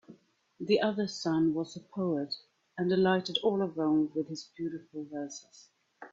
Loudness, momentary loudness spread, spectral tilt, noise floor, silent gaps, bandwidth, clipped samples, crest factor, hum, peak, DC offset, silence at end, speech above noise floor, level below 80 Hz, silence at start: -31 LUFS; 13 LU; -5.5 dB/octave; -58 dBFS; none; 7.8 kHz; under 0.1%; 18 dB; none; -14 dBFS; under 0.1%; 0.05 s; 27 dB; -72 dBFS; 0.1 s